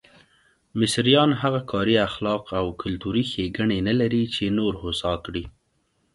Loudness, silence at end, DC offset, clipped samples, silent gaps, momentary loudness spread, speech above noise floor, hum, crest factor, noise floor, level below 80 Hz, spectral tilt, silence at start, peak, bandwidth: -23 LUFS; 0.65 s; under 0.1%; under 0.1%; none; 11 LU; 46 dB; none; 20 dB; -69 dBFS; -46 dBFS; -5.5 dB/octave; 0.75 s; -4 dBFS; 11.5 kHz